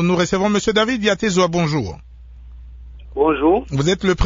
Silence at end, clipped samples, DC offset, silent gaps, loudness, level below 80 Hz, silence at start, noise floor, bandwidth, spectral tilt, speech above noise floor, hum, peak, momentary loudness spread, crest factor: 0 s; under 0.1%; under 0.1%; none; -18 LUFS; -38 dBFS; 0 s; -39 dBFS; 7.8 kHz; -5 dB/octave; 22 dB; none; -2 dBFS; 7 LU; 16 dB